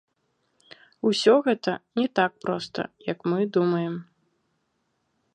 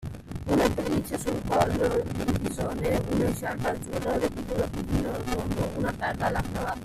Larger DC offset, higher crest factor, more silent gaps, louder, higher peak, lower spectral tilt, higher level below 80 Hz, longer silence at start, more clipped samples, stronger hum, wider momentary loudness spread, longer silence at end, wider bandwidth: neither; about the same, 20 dB vs 20 dB; neither; first, -25 LUFS vs -28 LUFS; about the same, -6 dBFS vs -8 dBFS; about the same, -5.5 dB/octave vs -6 dB/octave; second, -74 dBFS vs -40 dBFS; first, 1.05 s vs 0 s; neither; neither; first, 12 LU vs 6 LU; first, 1.3 s vs 0 s; second, 9.6 kHz vs 15.5 kHz